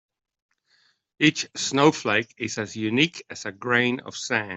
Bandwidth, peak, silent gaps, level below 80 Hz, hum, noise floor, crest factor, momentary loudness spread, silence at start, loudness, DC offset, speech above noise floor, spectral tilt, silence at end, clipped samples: 8.2 kHz; -4 dBFS; none; -66 dBFS; none; -65 dBFS; 20 dB; 11 LU; 1.2 s; -23 LUFS; under 0.1%; 41 dB; -4 dB/octave; 0 s; under 0.1%